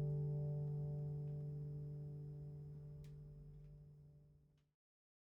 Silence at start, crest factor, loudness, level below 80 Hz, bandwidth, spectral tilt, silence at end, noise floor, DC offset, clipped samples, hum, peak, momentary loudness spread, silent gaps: 0 s; 14 dB; -48 LUFS; -66 dBFS; 1.4 kHz; -11.5 dB/octave; 0.8 s; -72 dBFS; under 0.1%; under 0.1%; none; -34 dBFS; 19 LU; none